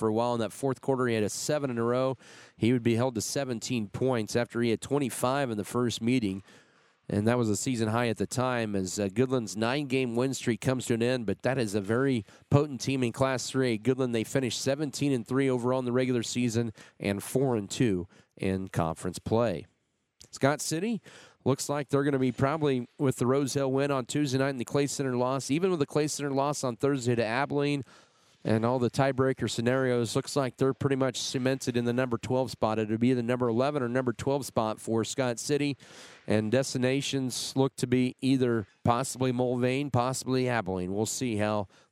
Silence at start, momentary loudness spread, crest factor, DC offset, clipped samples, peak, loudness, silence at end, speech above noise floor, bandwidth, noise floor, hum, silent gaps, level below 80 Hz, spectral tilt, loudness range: 0 s; 4 LU; 22 dB; under 0.1%; under 0.1%; -8 dBFS; -29 LUFS; 0.25 s; 34 dB; 16 kHz; -62 dBFS; none; none; -64 dBFS; -5.5 dB/octave; 2 LU